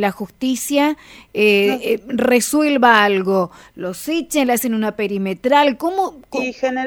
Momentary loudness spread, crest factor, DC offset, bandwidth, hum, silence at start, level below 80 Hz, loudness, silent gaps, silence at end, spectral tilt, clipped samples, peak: 11 LU; 18 dB; under 0.1%; 20 kHz; none; 0 s; -56 dBFS; -17 LUFS; none; 0 s; -4 dB/octave; under 0.1%; 0 dBFS